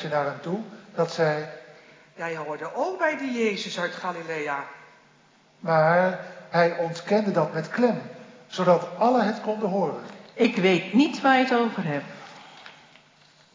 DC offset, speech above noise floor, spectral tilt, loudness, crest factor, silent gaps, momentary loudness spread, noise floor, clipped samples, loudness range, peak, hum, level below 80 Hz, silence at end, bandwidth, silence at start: under 0.1%; 34 dB; -6 dB/octave; -25 LUFS; 20 dB; none; 18 LU; -58 dBFS; under 0.1%; 6 LU; -6 dBFS; none; -82 dBFS; 0.85 s; 7.6 kHz; 0 s